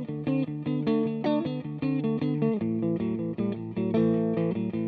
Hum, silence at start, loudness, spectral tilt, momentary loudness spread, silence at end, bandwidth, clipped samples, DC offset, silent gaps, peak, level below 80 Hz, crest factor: none; 0 s; -28 LUFS; -11 dB/octave; 5 LU; 0 s; 4.9 kHz; under 0.1%; under 0.1%; none; -12 dBFS; -62 dBFS; 14 dB